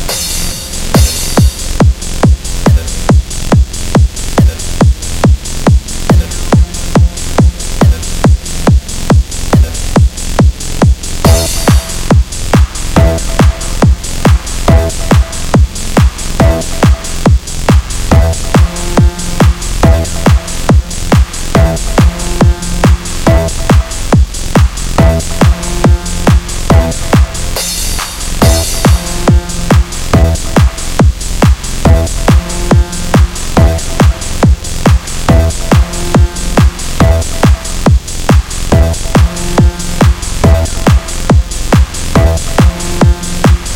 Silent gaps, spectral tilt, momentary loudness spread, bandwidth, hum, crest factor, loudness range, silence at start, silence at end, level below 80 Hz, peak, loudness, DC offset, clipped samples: none; -5.5 dB/octave; 2 LU; 16.5 kHz; none; 8 dB; 1 LU; 0 s; 0 s; -12 dBFS; 0 dBFS; -11 LUFS; under 0.1%; 1%